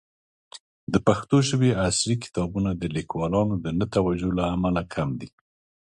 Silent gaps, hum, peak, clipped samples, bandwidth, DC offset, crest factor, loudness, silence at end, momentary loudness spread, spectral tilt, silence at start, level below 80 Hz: 0.60-0.87 s; none; -4 dBFS; under 0.1%; 11.5 kHz; under 0.1%; 20 dB; -24 LUFS; 0.6 s; 8 LU; -5.5 dB/octave; 0.55 s; -44 dBFS